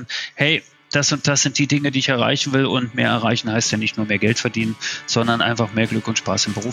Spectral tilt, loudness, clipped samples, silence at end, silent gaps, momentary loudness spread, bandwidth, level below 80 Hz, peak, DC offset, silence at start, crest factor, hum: -3.5 dB/octave; -19 LUFS; under 0.1%; 0 s; none; 5 LU; 12 kHz; -58 dBFS; -2 dBFS; under 0.1%; 0 s; 18 dB; none